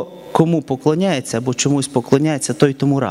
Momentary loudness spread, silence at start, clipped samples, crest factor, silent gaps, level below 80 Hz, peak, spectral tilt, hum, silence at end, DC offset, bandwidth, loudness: 3 LU; 0 s; under 0.1%; 16 dB; none; -56 dBFS; 0 dBFS; -5.5 dB/octave; none; 0 s; under 0.1%; 15 kHz; -17 LUFS